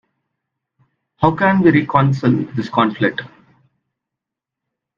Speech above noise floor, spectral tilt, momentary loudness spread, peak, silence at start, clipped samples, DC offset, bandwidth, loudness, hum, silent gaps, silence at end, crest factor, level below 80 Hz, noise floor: 69 dB; -8.5 dB/octave; 7 LU; 0 dBFS; 1.2 s; under 0.1%; under 0.1%; 7.2 kHz; -16 LUFS; none; none; 1.7 s; 18 dB; -50 dBFS; -84 dBFS